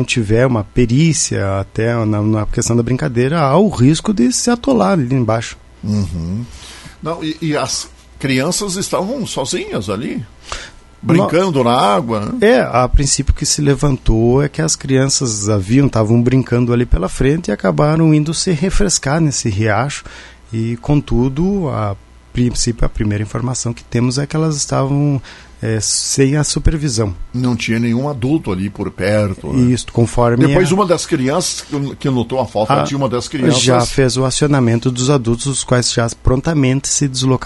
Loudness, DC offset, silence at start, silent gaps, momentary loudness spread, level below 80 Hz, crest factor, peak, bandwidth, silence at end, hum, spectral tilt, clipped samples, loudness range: -15 LUFS; under 0.1%; 0 s; none; 9 LU; -28 dBFS; 14 dB; 0 dBFS; 12 kHz; 0 s; none; -5 dB/octave; under 0.1%; 5 LU